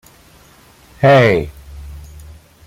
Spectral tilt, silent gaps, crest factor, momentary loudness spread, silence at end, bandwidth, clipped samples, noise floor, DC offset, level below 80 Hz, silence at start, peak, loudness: -7 dB/octave; none; 16 dB; 26 LU; 0.65 s; 15.5 kHz; under 0.1%; -46 dBFS; under 0.1%; -38 dBFS; 1 s; -2 dBFS; -12 LUFS